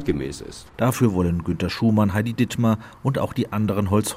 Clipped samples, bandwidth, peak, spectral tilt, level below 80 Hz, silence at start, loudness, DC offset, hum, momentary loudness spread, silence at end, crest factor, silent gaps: under 0.1%; 16 kHz; -6 dBFS; -6.5 dB/octave; -48 dBFS; 0 s; -22 LUFS; under 0.1%; none; 7 LU; 0 s; 16 dB; none